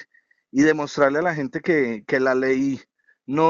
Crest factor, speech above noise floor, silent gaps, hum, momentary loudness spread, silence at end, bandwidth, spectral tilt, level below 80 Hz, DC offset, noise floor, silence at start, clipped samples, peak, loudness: 18 dB; 34 dB; none; none; 8 LU; 0 s; 7.6 kHz; -5 dB/octave; -60 dBFS; under 0.1%; -54 dBFS; 0 s; under 0.1%; -4 dBFS; -21 LUFS